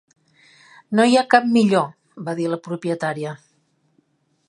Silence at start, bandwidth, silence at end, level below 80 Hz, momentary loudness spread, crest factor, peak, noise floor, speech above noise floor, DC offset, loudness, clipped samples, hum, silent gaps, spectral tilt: 0.9 s; 11 kHz; 1.15 s; -72 dBFS; 15 LU; 20 dB; 0 dBFS; -65 dBFS; 46 dB; under 0.1%; -19 LUFS; under 0.1%; none; none; -5.5 dB/octave